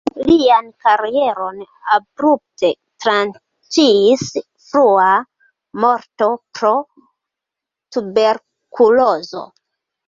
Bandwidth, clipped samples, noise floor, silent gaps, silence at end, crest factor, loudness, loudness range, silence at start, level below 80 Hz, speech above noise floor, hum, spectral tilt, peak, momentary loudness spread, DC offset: 7.8 kHz; under 0.1%; -84 dBFS; none; 0.6 s; 14 dB; -15 LUFS; 4 LU; 0.05 s; -54 dBFS; 70 dB; none; -4 dB/octave; -2 dBFS; 13 LU; under 0.1%